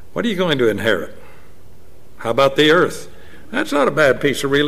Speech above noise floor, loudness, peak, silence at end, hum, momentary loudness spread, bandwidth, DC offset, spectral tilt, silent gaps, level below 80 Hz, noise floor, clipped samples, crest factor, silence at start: 31 dB; -17 LUFS; -4 dBFS; 0 s; none; 12 LU; 16 kHz; 3%; -4.5 dB/octave; none; -50 dBFS; -47 dBFS; under 0.1%; 16 dB; 0.15 s